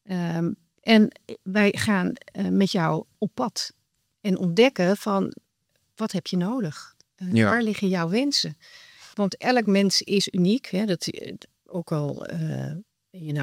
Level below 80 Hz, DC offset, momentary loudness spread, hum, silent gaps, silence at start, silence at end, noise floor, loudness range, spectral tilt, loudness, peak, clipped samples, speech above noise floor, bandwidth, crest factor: -70 dBFS; under 0.1%; 15 LU; none; none; 0.1 s; 0 s; -72 dBFS; 3 LU; -5 dB/octave; -24 LUFS; -6 dBFS; under 0.1%; 49 dB; 15.5 kHz; 20 dB